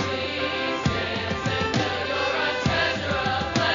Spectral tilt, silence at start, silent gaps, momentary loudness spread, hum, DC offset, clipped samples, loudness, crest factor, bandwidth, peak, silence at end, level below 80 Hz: -2.5 dB/octave; 0 s; none; 3 LU; none; under 0.1%; under 0.1%; -24 LUFS; 18 dB; 7.4 kHz; -8 dBFS; 0 s; -44 dBFS